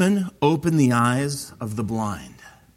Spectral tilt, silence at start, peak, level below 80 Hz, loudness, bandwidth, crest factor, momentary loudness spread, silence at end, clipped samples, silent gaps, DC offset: -6 dB/octave; 0 s; -6 dBFS; -54 dBFS; -22 LUFS; 16.5 kHz; 16 dB; 11 LU; 0.3 s; under 0.1%; none; under 0.1%